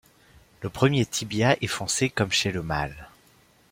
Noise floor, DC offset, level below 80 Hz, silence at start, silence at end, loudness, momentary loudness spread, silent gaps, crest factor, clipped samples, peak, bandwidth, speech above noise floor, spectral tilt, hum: -59 dBFS; under 0.1%; -50 dBFS; 0.6 s; 0.65 s; -25 LUFS; 13 LU; none; 22 dB; under 0.1%; -6 dBFS; 16.5 kHz; 34 dB; -4 dB/octave; none